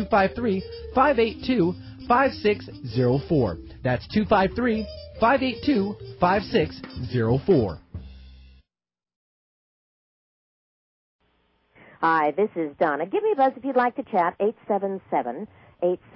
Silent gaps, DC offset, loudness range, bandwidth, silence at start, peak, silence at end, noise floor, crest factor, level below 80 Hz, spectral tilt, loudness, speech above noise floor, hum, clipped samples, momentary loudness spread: 9.16-11.19 s; under 0.1%; 5 LU; 5.8 kHz; 0 s; -6 dBFS; 0.2 s; under -90 dBFS; 18 dB; -46 dBFS; -11 dB/octave; -24 LUFS; over 67 dB; none; under 0.1%; 10 LU